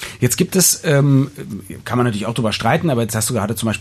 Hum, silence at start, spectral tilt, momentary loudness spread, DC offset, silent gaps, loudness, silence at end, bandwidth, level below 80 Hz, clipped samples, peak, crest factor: none; 0 s; -4.5 dB/octave; 11 LU; under 0.1%; none; -17 LUFS; 0 s; 14 kHz; -50 dBFS; under 0.1%; -2 dBFS; 16 dB